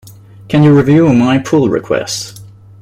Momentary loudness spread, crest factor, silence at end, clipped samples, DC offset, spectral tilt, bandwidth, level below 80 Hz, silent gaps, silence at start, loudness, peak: 12 LU; 10 dB; 0.35 s; under 0.1%; under 0.1%; -6.5 dB/octave; 15.5 kHz; -44 dBFS; none; 0.05 s; -11 LUFS; -2 dBFS